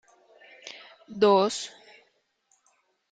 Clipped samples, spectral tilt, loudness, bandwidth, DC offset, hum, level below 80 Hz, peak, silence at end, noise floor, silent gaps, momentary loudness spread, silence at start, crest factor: under 0.1%; -4 dB/octave; -24 LUFS; 9.4 kHz; under 0.1%; none; -76 dBFS; -10 dBFS; 1.45 s; -70 dBFS; none; 24 LU; 0.65 s; 20 dB